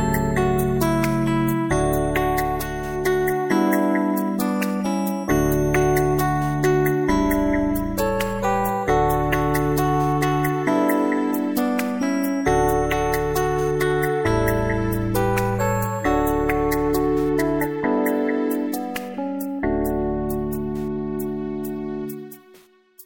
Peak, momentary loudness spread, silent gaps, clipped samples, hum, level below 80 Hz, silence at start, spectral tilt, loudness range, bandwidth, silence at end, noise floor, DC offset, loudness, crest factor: -6 dBFS; 7 LU; none; under 0.1%; none; -34 dBFS; 0 s; -6.5 dB/octave; 4 LU; 17 kHz; 0.05 s; -52 dBFS; under 0.1%; -22 LUFS; 16 dB